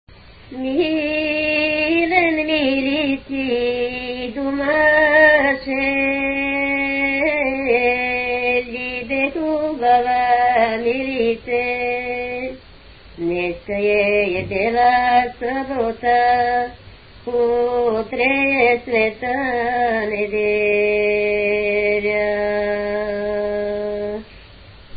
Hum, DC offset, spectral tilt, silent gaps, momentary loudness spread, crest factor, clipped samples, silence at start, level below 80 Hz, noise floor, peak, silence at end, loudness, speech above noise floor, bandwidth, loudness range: none; under 0.1%; -9.5 dB/octave; none; 8 LU; 18 dB; under 0.1%; 0.1 s; -46 dBFS; -43 dBFS; -2 dBFS; 0 s; -18 LUFS; 25 dB; 5 kHz; 4 LU